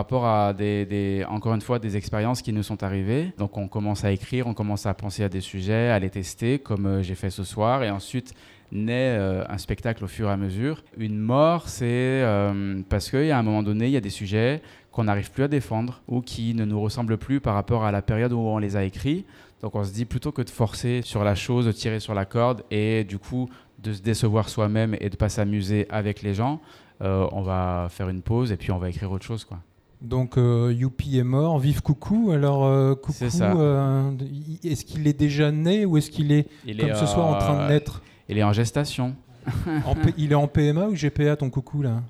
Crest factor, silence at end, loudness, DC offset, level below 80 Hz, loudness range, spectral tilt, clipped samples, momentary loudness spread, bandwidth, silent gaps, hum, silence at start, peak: 16 dB; 0 s; -24 LUFS; under 0.1%; -44 dBFS; 5 LU; -7 dB/octave; under 0.1%; 9 LU; 14 kHz; none; none; 0 s; -8 dBFS